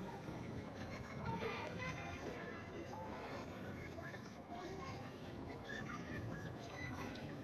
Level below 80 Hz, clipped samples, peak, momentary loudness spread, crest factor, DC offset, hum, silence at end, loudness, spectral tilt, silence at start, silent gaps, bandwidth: -66 dBFS; under 0.1%; -32 dBFS; 6 LU; 16 dB; under 0.1%; none; 0 s; -48 LUFS; -6 dB/octave; 0 s; none; 13.5 kHz